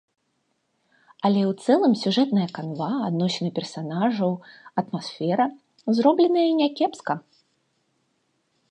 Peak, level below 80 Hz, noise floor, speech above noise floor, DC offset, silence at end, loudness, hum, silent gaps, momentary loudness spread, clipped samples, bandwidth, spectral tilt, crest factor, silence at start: -6 dBFS; -76 dBFS; -72 dBFS; 50 dB; under 0.1%; 1.5 s; -23 LUFS; none; none; 11 LU; under 0.1%; 9.6 kHz; -6.5 dB/octave; 20 dB; 1.2 s